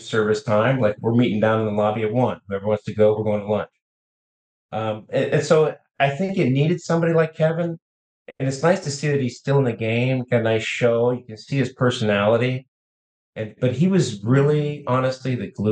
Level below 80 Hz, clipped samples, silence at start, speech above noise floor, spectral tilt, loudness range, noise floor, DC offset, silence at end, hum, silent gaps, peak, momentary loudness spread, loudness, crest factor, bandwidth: -62 dBFS; under 0.1%; 0 s; over 70 dB; -6.5 dB/octave; 3 LU; under -90 dBFS; under 0.1%; 0 s; none; 3.82-4.69 s, 7.82-8.26 s, 12.68-13.33 s; -4 dBFS; 9 LU; -21 LUFS; 16 dB; 9.4 kHz